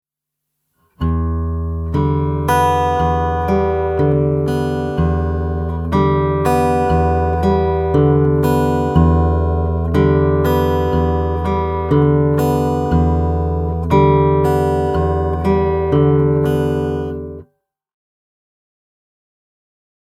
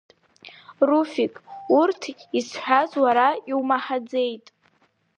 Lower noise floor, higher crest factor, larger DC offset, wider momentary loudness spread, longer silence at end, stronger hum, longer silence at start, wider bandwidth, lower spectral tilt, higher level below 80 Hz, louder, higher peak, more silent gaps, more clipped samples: first, -79 dBFS vs -65 dBFS; about the same, 16 dB vs 20 dB; neither; second, 6 LU vs 9 LU; first, 2.6 s vs 0.8 s; neither; first, 1 s vs 0.45 s; first, 15 kHz vs 9.6 kHz; first, -8.5 dB/octave vs -4 dB/octave; first, -26 dBFS vs -76 dBFS; first, -16 LUFS vs -22 LUFS; first, 0 dBFS vs -4 dBFS; neither; neither